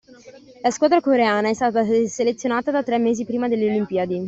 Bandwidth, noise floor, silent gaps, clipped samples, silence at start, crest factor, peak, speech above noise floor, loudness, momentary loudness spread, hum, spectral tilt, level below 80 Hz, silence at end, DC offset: 8 kHz; -45 dBFS; none; under 0.1%; 0.25 s; 16 dB; -4 dBFS; 25 dB; -20 LUFS; 6 LU; none; -5 dB/octave; -62 dBFS; 0 s; under 0.1%